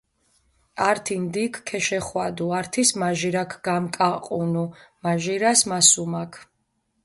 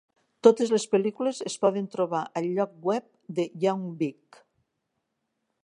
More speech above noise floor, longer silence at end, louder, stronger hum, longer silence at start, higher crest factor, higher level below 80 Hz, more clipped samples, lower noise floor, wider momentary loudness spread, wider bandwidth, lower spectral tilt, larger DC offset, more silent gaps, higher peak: second, 49 dB vs 54 dB; second, 0.6 s vs 1.5 s; first, -22 LUFS vs -27 LUFS; neither; first, 0.75 s vs 0.45 s; about the same, 22 dB vs 24 dB; first, -62 dBFS vs -82 dBFS; neither; second, -72 dBFS vs -80 dBFS; first, 13 LU vs 10 LU; about the same, 12 kHz vs 11 kHz; second, -3 dB/octave vs -5.5 dB/octave; neither; neither; about the same, -2 dBFS vs -2 dBFS